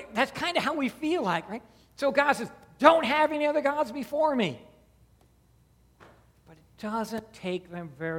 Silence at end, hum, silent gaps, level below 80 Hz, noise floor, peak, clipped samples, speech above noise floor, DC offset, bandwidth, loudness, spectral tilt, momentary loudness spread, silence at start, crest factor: 0 s; none; none; -64 dBFS; -62 dBFS; -2 dBFS; under 0.1%; 35 dB; under 0.1%; 16.5 kHz; -27 LUFS; -5 dB/octave; 15 LU; 0 s; 26 dB